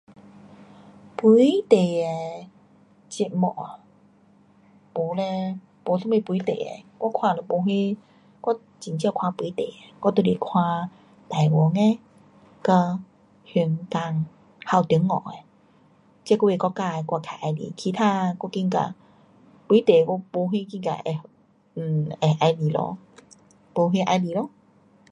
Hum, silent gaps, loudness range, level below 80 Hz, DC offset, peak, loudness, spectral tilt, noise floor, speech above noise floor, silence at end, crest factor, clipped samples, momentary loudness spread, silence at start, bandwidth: none; none; 5 LU; -68 dBFS; under 0.1%; -2 dBFS; -24 LUFS; -7.5 dB/octave; -57 dBFS; 35 dB; 0.65 s; 22 dB; under 0.1%; 14 LU; 0.45 s; 10.5 kHz